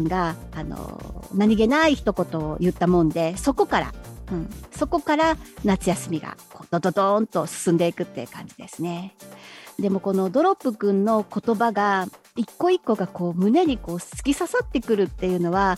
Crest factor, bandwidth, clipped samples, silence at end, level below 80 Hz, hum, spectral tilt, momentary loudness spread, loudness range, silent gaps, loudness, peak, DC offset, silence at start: 18 dB; 15.5 kHz; under 0.1%; 0 s; -42 dBFS; none; -6 dB/octave; 15 LU; 4 LU; none; -23 LUFS; -6 dBFS; under 0.1%; 0 s